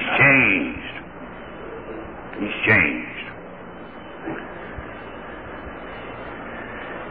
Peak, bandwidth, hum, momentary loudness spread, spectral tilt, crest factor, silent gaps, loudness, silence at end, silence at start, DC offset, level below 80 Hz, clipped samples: -4 dBFS; 4.9 kHz; none; 22 LU; -9 dB/octave; 20 dB; none; -19 LUFS; 0 s; 0 s; 0.4%; -48 dBFS; under 0.1%